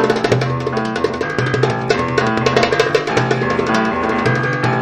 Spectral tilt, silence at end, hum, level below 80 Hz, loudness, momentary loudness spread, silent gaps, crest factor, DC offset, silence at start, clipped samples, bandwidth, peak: -5.5 dB/octave; 0 s; none; -42 dBFS; -16 LUFS; 5 LU; none; 16 dB; under 0.1%; 0 s; under 0.1%; 11 kHz; 0 dBFS